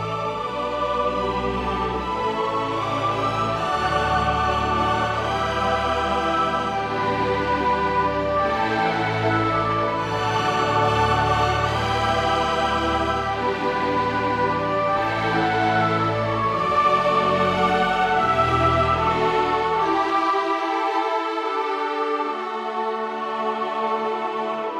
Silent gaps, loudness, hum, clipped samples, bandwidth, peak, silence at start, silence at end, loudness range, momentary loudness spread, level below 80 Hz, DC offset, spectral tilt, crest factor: none; -22 LUFS; none; under 0.1%; 14 kHz; -8 dBFS; 0 s; 0 s; 4 LU; 5 LU; -40 dBFS; under 0.1%; -5.5 dB/octave; 14 dB